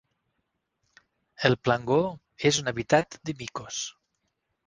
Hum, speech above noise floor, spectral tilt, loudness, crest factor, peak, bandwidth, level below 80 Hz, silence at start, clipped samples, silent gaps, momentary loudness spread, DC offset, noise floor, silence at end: none; 53 dB; -4 dB/octave; -27 LUFS; 24 dB; -6 dBFS; 10.5 kHz; -60 dBFS; 1.4 s; under 0.1%; none; 11 LU; under 0.1%; -79 dBFS; 0.8 s